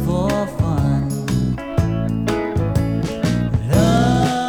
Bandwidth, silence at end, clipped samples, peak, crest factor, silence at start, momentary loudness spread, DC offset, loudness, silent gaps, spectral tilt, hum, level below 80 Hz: 19 kHz; 0 s; under 0.1%; -2 dBFS; 16 dB; 0 s; 6 LU; under 0.1%; -19 LUFS; none; -7 dB/octave; none; -30 dBFS